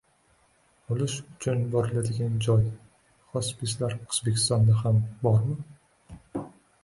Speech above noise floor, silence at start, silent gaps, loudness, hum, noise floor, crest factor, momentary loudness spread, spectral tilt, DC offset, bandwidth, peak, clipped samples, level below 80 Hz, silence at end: 39 dB; 0.9 s; none; -27 LUFS; none; -65 dBFS; 16 dB; 16 LU; -5.5 dB/octave; under 0.1%; 11.5 kHz; -10 dBFS; under 0.1%; -54 dBFS; 0.35 s